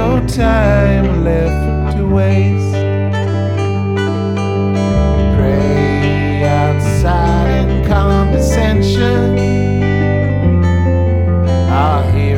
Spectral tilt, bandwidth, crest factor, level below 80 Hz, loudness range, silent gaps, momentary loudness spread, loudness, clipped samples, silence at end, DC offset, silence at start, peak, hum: -7.5 dB/octave; 11.5 kHz; 10 dB; -20 dBFS; 2 LU; none; 4 LU; -13 LUFS; under 0.1%; 0 s; 0.2%; 0 s; -2 dBFS; none